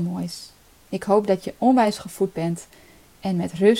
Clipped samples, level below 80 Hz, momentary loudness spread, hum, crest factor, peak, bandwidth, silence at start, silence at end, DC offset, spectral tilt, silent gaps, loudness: under 0.1%; -58 dBFS; 14 LU; none; 18 dB; -4 dBFS; 16.5 kHz; 0 s; 0 s; under 0.1%; -6.5 dB/octave; none; -23 LUFS